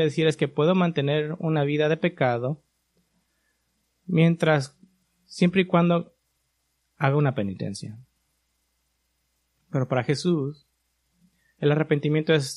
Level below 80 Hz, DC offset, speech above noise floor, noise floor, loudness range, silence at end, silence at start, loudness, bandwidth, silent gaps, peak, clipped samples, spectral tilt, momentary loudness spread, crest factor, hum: -66 dBFS; under 0.1%; 51 dB; -73 dBFS; 6 LU; 0 s; 0 s; -24 LUFS; 11.5 kHz; none; -4 dBFS; under 0.1%; -7 dB/octave; 12 LU; 20 dB; none